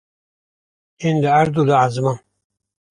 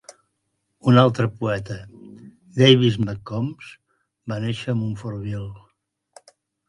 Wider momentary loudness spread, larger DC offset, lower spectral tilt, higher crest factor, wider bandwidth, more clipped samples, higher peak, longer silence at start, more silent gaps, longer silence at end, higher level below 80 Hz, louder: second, 9 LU vs 20 LU; neither; about the same, -7 dB/octave vs -7 dB/octave; second, 16 dB vs 22 dB; about the same, 10.5 kHz vs 11 kHz; neither; about the same, -2 dBFS vs 0 dBFS; first, 1 s vs 0.85 s; neither; second, 0.75 s vs 1.1 s; about the same, -56 dBFS vs -54 dBFS; first, -17 LUFS vs -21 LUFS